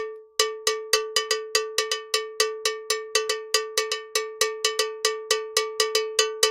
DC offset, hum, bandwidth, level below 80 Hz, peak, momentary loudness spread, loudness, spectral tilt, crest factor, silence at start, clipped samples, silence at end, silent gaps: under 0.1%; none; 17 kHz; -66 dBFS; -4 dBFS; 4 LU; -24 LUFS; 3 dB/octave; 24 dB; 0 s; under 0.1%; 0 s; none